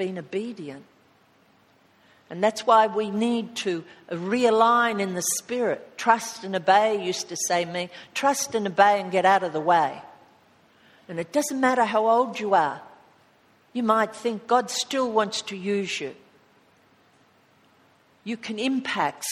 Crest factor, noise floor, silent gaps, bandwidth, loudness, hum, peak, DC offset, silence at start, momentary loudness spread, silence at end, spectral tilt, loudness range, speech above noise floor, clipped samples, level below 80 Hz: 22 dB; -60 dBFS; none; 15.5 kHz; -24 LUFS; none; -4 dBFS; under 0.1%; 0 s; 14 LU; 0 s; -3.5 dB/octave; 7 LU; 36 dB; under 0.1%; -74 dBFS